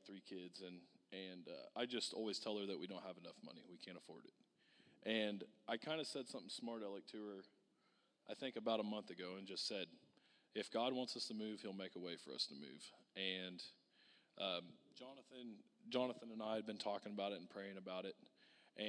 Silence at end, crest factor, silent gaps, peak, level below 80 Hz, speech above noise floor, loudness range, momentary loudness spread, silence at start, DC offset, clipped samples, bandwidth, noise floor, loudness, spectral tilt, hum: 0 s; 22 dB; none; -26 dBFS; under -90 dBFS; 32 dB; 3 LU; 15 LU; 0 s; under 0.1%; under 0.1%; 11 kHz; -80 dBFS; -48 LUFS; -3.5 dB/octave; none